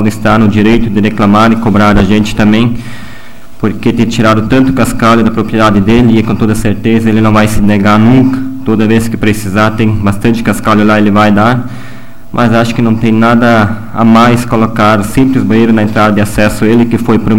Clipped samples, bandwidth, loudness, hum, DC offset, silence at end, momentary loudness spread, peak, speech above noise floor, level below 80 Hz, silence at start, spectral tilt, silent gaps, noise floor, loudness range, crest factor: 0.4%; 16.5 kHz; -8 LUFS; none; 9%; 0 s; 5 LU; 0 dBFS; 25 dB; -26 dBFS; 0 s; -6.5 dB/octave; none; -32 dBFS; 2 LU; 8 dB